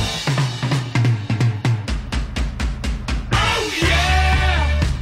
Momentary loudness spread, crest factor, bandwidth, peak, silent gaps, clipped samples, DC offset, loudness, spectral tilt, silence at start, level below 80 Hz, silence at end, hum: 9 LU; 14 dB; 14 kHz; -4 dBFS; none; under 0.1%; under 0.1%; -19 LUFS; -5 dB/octave; 0 s; -24 dBFS; 0 s; none